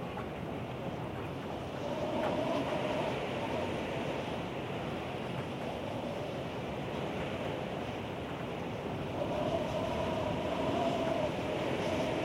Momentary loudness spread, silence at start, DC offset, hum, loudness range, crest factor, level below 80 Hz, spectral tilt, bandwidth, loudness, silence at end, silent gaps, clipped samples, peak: 6 LU; 0 s; under 0.1%; none; 4 LU; 14 dB; -56 dBFS; -6 dB/octave; 16 kHz; -36 LUFS; 0 s; none; under 0.1%; -20 dBFS